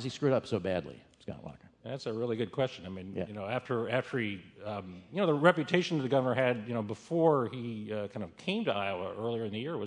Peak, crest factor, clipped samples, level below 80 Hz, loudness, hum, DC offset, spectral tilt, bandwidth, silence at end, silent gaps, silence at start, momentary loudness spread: -8 dBFS; 24 dB; under 0.1%; -72 dBFS; -32 LUFS; none; under 0.1%; -6.5 dB/octave; 10.5 kHz; 0 s; none; 0 s; 15 LU